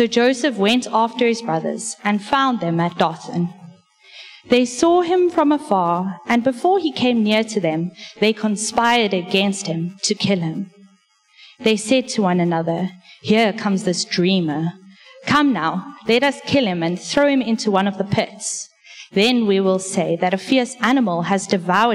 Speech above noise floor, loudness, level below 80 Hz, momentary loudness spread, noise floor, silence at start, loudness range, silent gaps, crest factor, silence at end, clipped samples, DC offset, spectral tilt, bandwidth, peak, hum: 39 dB; -19 LUFS; -60 dBFS; 9 LU; -57 dBFS; 0 s; 3 LU; none; 16 dB; 0 s; under 0.1%; under 0.1%; -4.5 dB/octave; 13.5 kHz; -4 dBFS; none